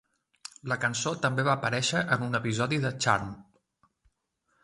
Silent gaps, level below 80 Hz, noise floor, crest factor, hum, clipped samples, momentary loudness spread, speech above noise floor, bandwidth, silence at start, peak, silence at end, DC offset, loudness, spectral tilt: none; -62 dBFS; -76 dBFS; 22 dB; none; under 0.1%; 15 LU; 47 dB; 11.5 kHz; 0.65 s; -8 dBFS; 1.2 s; under 0.1%; -28 LUFS; -4 dB/octave